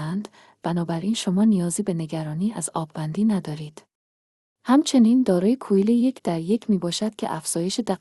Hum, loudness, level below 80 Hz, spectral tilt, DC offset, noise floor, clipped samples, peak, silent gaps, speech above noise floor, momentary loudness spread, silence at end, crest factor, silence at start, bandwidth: none; -23 LUFS; -64 dBFS; -5.5 dB/octave; under 0.1%; under -90 dBFS; under 0.1%; -6 dBFS; 3.95-4.56 s; over 68 dB; 12 LU; 0.05 s; 16 dB; 0 s; 12.5 kHz